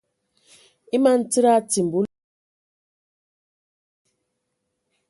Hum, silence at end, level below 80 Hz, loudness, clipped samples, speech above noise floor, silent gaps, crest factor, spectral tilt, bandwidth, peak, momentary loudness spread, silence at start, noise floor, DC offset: none; 3.05 s; -70 dBFS; -20 LUFS; under 0.1%; 59 dB; none; 20 dB; -4.5 dB/octave; 11.5 kHz; -6 dBFS; 8 LU; 0.95 s; -77 dBFS; under 0.1%